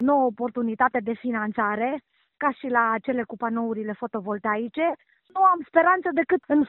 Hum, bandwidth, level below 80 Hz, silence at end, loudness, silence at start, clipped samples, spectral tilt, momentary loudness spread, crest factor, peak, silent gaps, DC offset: none; 4.2 kHz; -66 dBFS; 0 s; -24 LUFS; 0 s; under 0.1%; -4.5 dB/octave; 9 LU; 20 dB; -4 dBFS; none; under 0.1%